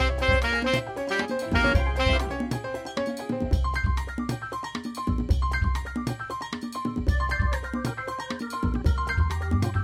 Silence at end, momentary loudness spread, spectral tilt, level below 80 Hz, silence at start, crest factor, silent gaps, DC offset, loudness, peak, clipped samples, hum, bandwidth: 0 s; 9 LU; -6 dB/octave; -30 dBFS; 0 s; 16 dB; none; under 0.1%; -27 LUFS; -10 dBFS; under 0.1%; none; 14.5 kHz